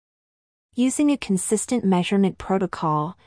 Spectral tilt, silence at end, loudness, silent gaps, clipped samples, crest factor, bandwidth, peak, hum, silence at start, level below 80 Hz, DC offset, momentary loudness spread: -5.5 dB/octave; 0.15 s; -22 LUFS; none; under 0.1%; 14 dB; 10.5 kHz; -8 dBFS; none; 0.75 s; -54 dBFS; under 0.1%; 4 LU